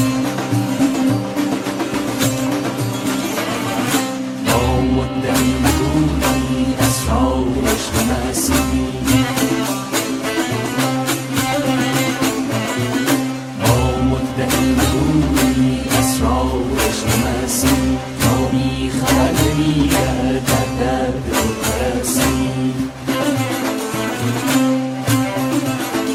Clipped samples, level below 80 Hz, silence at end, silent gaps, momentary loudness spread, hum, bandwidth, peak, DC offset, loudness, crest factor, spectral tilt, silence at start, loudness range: under 0.1%; -30 dBFS; 0 s; none; 5 LU; none; 16.5 kHz; -2 dBFS; under 0.1%; -17 LUFS; 16 dB; -4.5 dB/octave; 0 s; 2 LU